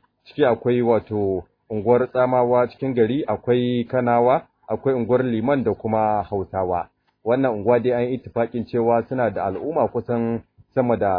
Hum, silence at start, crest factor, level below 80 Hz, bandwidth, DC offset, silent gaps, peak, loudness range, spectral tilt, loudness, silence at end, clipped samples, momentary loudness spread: none; 0.3 s; 16 dB; -54 dBFS; 4.9 kHz; under 0.1%; none; -4 dBFS; 2 LU; -11 dB/octave; -21 LUFS; 0 s; under 0.1%; 8 LU